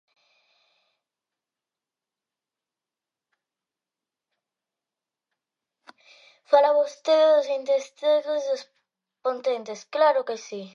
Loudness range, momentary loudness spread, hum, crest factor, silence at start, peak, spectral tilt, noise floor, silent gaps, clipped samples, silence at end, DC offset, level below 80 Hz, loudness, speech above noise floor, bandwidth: 4 LU; 13 LU; none; 22 dB; 6.5 s; -6 dBFS; -3 dB/octave; -90 dBFS; none; under 0.1%; 0.05 s; under 0.1%; under -90 dBFS; -23 LUFS; 67 dB; 7.4 kHz